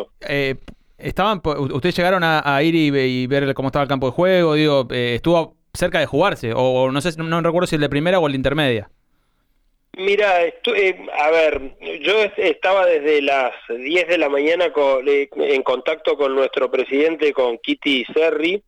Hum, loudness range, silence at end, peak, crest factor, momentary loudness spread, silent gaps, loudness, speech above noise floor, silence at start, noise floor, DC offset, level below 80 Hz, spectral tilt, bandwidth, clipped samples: none; 2 LU; 0.1 s; -6 dBFS; 12 dB; 6 LU; none; -18 LUFS; 45 dB; 0 s; -63 dBFS; under 0.1%; -44 dBFS; -6 dB/octave; 14 kHz; under 0.1%